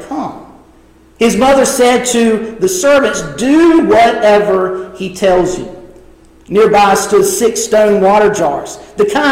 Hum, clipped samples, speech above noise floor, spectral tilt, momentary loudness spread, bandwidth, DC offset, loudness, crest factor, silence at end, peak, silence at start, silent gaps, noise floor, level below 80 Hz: none; under 0.1%; 33 dB; -4 dB/octave; 13 LU; 16.5 kHz; under 0.1%; -10 LUFS; 10 dB; 0 s; 0 dBFS; 0 s; none; -43 dBFS; -40 dBFS